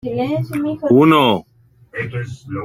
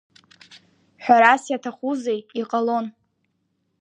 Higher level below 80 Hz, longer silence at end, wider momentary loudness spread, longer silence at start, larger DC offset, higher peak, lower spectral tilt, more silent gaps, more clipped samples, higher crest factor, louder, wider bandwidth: first, -52 dBFS vs -80 dBFS; second, 0 s vs 0.9 s; about the same, 16 LU vs 14 LU; second, 0.05 s vs 1 s; neither; about the same, -2 dBFS vs 0 dBFS; first, -7 dB/octave vs -4 dB/octave; neither; neither; second, 16 dB vs 22 dB; first, -16 LUFS vs -20 LUFS; first, 16 kHz vs 9.8 kHz